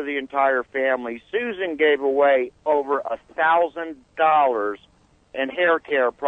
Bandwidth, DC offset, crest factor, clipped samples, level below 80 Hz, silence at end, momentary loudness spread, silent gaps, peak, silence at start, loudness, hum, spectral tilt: 4 kHz; under 0.1%; 14 dB; under 0.1%; -64 dBFS; 0 s; 10 LU; none; -6 dBFS; 0 s; -21 LUFS; none; -5.5 dB/octave